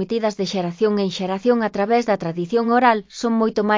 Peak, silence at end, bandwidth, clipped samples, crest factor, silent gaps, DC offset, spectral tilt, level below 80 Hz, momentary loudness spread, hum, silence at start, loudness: -2 dBFS; 0 s; 7.6 kHz; under 0.1%; 18 dB; none; under 0.1%; -6 dB/octave; -60 dBFS; 6 LU; none; 0 s; -20 LUFS